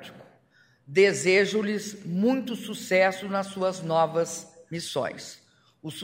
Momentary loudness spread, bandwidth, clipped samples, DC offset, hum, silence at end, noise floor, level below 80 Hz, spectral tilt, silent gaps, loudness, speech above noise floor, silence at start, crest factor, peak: 17 LU; 16 kHz; under 0.1%; under 0.1%; none; 0 s; -62 dBFS; -74 dBFS; -4.5 dB/octave; none; -26 LUFS; 36 dB; 0 s; 20 dB; -8 dBFS